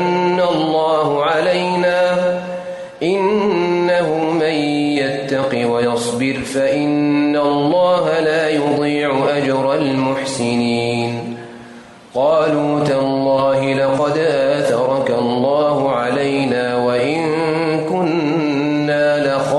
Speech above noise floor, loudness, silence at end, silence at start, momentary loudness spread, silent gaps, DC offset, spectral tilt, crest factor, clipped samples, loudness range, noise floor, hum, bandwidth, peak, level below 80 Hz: 23 dB; -16 LUFS; 0 s; 0 s; 4 LU; none; under 0.1%; -6 dB/octave; 12 dB; under 0.1%; 2 LU; -38 dBFS; none; 11.5 kHz; -4 dBFS; -56 dBFS